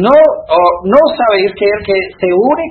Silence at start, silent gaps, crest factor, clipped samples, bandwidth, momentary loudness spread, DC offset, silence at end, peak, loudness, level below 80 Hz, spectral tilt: 0 s; none; 10 dB; 0.3%; 4.4 kHz; 6 LU; under 0.1%; 0 s; 0 dBFS; -10 LUFS; -44 dBFS; -8 dB/octave